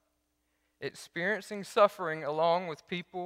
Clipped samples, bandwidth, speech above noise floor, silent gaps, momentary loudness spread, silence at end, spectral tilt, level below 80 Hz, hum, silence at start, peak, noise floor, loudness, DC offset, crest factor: under 0.1%; 15.5 kHz; 47 dB; none; 14 LU; 0 s; -4.5 dB/octave; -78 dBFS; none; 0.8 s; -10 dBFS; -78 dBFS; -31 LUFS; under 0.1%; 22 dB